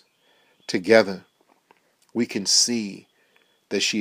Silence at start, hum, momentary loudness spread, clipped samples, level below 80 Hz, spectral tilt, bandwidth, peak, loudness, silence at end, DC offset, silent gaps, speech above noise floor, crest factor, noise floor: 0.7 s; none; 17 LU; under 0.1%; -76 dBFS; -2 dB/octave; 15.5 kHz; -2 dBFS; -21 LUFS; 0 s; under 0.1%; none; 42 dB; 24 dB; -63 dBFS